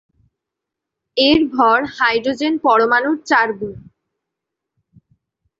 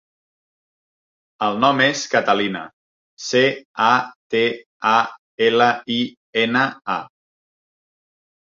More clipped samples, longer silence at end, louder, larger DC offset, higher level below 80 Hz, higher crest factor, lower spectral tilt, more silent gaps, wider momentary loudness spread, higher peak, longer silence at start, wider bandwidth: neither; first, 1.8 s vs 1.5 s; first, -15 LUFS vs -19 LUFS; neither; first, -52 dBFS vs -66 dBFS; about the same, 16 dB vs 20 dB; about the same, -4.5 dB/octave vs -4 dB/octave; second, none vs 2.73-3.17 s, 3.65-3.74 s, 4.16-4.30 s, 4.66-4.80 s, 5.18-5.38 s, 6.17-6.33 s; about the same, 8 LU vs 10 LU; about the same, -2 dBFS vs -2 dBFS; second, 1.15 s vs 1.4 s; about the same, 7.8 kHz vs 7.6 kHz